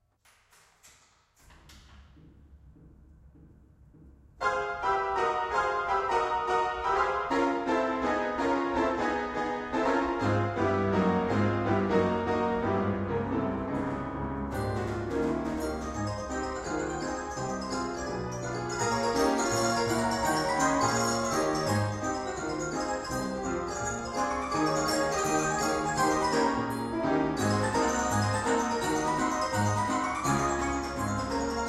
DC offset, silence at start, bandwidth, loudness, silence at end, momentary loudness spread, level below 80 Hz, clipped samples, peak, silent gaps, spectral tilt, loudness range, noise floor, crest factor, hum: under 0.1%; 0.85 s; 15.5 kHz; -29 LUFS; 0 s; 7 LU; -48 dBFS; under 0.1%; -12 dBFS; none; -4.5 dB/octave; 5 LU; -65 dBFS; 16 dB; none